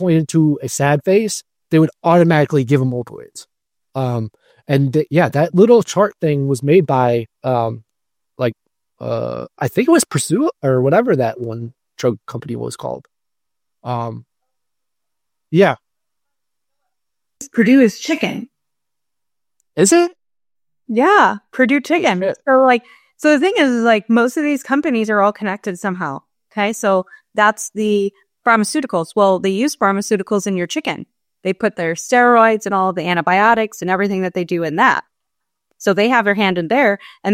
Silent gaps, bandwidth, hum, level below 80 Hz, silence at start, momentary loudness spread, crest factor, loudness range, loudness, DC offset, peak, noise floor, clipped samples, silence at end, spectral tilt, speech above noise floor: none; 16.5 kHz; none; -62 dBFS; 0 s; 13 LU; 16 dB; 7 LU; -16 LUFS; under 0.1%; 0 dBFS; under -90 dBFS; under 0.1%; 0 s; -5.5 dB/octave; over 75 dB